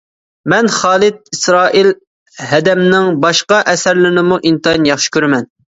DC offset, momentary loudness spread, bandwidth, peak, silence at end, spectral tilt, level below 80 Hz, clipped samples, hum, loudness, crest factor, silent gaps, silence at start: under 0.1%; 5 LU; 8 kHz; 0 dBFS; 0.35 s; -4 dB/octave; -50 dBFS; under 0.1%; none; -11 LUFS; 12 dB; 2.07-2.26 s; 0.45 s